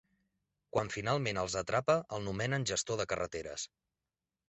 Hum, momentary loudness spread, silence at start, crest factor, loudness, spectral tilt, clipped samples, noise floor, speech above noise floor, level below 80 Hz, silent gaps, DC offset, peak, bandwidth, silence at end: none; 8 LU; 0.75 s; 20 dB; -35 LUFS; -4 dB/octave; under 0.1%; under -90 dBFS; over 55 dB; -60 dBFS; none; under 0.1%; -16 dBFS; 8.2 kHz; 0.85 s